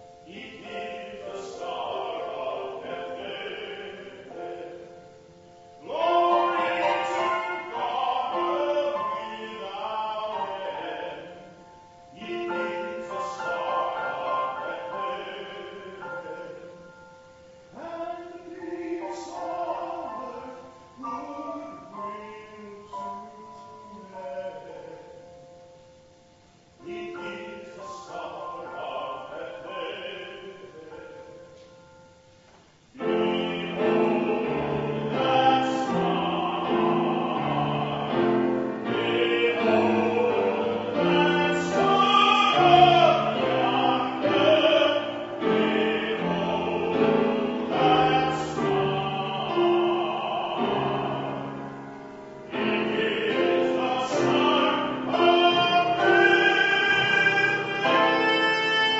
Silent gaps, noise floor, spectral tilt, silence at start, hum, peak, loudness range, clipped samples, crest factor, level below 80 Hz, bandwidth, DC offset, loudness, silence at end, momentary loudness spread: none; -56 dBFS; -5 dB/octave; 0 s; none; -6 dBFS; 19 LU; under 0.1%; 20 dB; -62 dBFS; 8 kHz; under 0.1%; -24 LUFS; 0 s; 20 LU